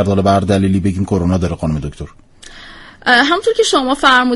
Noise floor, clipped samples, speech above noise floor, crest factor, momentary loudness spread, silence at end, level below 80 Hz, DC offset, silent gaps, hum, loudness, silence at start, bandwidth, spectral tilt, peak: -36 dBFS; under 0.1%; 23 dB; 14 dB; 19 LU; 0 s; -36 dBFS; under 0.1%; none; none; -14 LUFS; 0 s; 11.5 kHz; -5 dB/octave; 0 dBFS